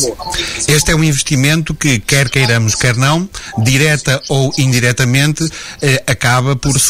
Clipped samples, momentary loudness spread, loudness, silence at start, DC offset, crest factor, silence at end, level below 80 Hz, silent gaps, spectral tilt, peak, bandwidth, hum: under 0.1%; 6 LU; -12 LUFS; 0 s; under 0.1%; 12 dB; 0 s; -32 dBFS; none; -4 dB/octave; 0 dBFS; 16 kHz; none